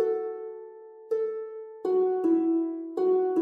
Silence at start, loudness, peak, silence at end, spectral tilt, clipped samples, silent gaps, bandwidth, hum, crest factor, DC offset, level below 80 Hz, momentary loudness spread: 0 s; -28 LUFS; -16 dBFS; 0 s; -8 dB/octave; under 0.1%; none; 4.4 kHz; none; 12 dB; under 0.1%; under -90 dBFS; 16 LU